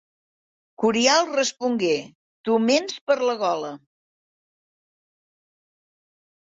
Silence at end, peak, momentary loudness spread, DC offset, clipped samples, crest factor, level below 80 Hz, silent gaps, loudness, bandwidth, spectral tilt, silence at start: 2.75 s; -2 dBFS; 9 LU; under 0.1%; under 0.1%; 22 dB; -72 dBFS; 2.15-2.44 s, 3.01-3.07 s; -22 LUFS; 8 kHz; -3 dB/octave; 0.8 s